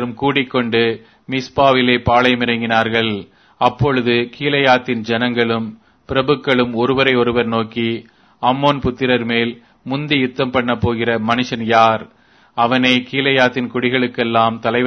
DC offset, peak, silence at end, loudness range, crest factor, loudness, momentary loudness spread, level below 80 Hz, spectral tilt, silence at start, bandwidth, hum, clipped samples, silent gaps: under 0.1%; 0 dBFS; 0 s; 2 LU; 16 dB; -16 LUFS; 8 LU; -46 dBFS; -6 dB/octave; 0 s; 6.6 kHz; none; under 0.1%; none